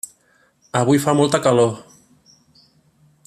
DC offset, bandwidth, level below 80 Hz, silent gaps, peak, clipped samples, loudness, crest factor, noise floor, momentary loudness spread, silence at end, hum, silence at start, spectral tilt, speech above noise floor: under 0.1%; 14.5 kHz; -60 dBFS; none; -2 dBFS; under 0.1%; -17 LUFS; 18 dB; -59 dBFS; 15 LU; 1.45 s; none; 0.75 s; -5.5 dB/octave; 43 dB